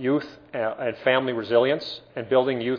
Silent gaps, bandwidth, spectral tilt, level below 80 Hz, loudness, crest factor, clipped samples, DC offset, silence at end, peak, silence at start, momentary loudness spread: none; 5.4 kHz; -7 dB/octave; -66 dBFS; -24 LUFS; 18 dB; under 0.1%; under 0.1%; 0 s; -6 dBFS; 0 s; 11 LU